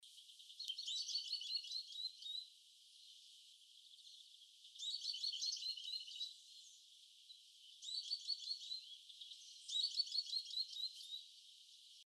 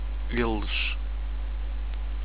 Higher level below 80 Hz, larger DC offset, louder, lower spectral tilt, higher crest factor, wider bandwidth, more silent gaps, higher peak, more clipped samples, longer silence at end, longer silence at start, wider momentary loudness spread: second, under -90 dBFS vs -30 dBFS; second, under 0.1% vs 2%; second, -44 LUFS vs -31 LUFS; second, 8.5 dB/octave vs -9.5 dB/octave; about the same, 20 dB vs 16 dB; first, 13 kHz vs 4 kHz; neither; second, -28 dBFS vs -12 dBFS; neither; about the same, 0 s vs 0 s; about the same, 0 s vs 0 s; first, 20 LU vs 7 LU